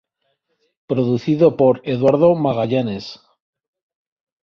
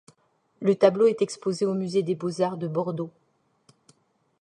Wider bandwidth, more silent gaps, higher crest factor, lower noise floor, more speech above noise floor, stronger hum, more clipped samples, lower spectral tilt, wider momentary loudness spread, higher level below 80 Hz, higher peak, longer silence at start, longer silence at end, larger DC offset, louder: second, 6.6 kHz vs 10.5 kHz; neither; about the same, 18 dB vs 22 dB; about the same, -70 dBFS vs -67 dBFS; first, 54 dB vs 43 dB; neither; neither; first, -8.5 dB/octave vs -6.5 dB/octave; about the same, 11 LU vs 10 LU; first, -56 dBFS vs -74 dBFS; first, -2 dBFS vs -6 dBFS; first, 0.9 s vs 0.6 s; about the same, 1.25 s vs 1.35 s; neither; first, -17 LUFS vs -25 LUFS